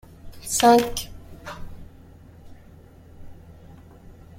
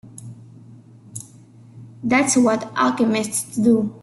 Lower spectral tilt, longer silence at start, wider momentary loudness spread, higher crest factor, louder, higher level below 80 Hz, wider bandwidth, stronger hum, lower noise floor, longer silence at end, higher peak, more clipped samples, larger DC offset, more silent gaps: about the same, -3.5 dB/octave vs -4 dB/octave; first, 0.25 s vs 0.05 s; first, 25 LU vs 21 LU; first, 22 dB vs 16 dB; about the same, -20 LUFS vs -19 LUFS; first, -46 dBFS vs -62 dBFS; first, 16.5 kHz vs 12.5 kHz; neither; about the same, -48 dBFS vs -46 dBFS; first, 0.65 s vs 0.05 s; about the same, -6 dBFS vs -6 dBFS; neither; neither; neither